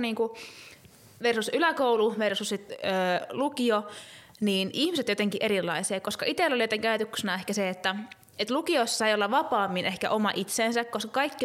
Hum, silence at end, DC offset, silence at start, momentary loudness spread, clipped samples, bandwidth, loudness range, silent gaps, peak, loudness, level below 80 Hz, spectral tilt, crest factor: none; 0 s; under 0.1%; 0 s; 8 LU; under 0.1%; 16.5 kHz; 1 LU; none; -12 dBFS; -27 LUFS; -72 dBFS; -3.5 dB/octave; 16 dB